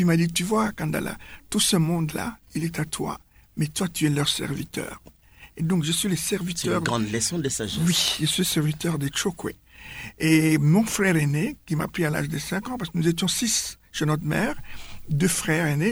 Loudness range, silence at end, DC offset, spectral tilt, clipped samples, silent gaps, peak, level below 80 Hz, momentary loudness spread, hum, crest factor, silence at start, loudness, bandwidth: 4 LU; 0 s; under 0.1%; -4.5 dB/octave; under 0.1%; none; -8 dBFS; -50 dBFS; 13 LU; none; 18 dB; 0 s; -24 LUFS; over 20 kHz